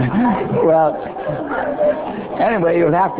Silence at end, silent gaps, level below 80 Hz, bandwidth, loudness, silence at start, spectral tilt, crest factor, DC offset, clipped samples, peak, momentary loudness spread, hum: 0 s; none; -46 dBFS; 4 kHz; -17 LUFS; 0 s; -11.5 dB/octave; 12 dB; under 0.1%; under 0.1%; -4 dBFS; 10 LU; none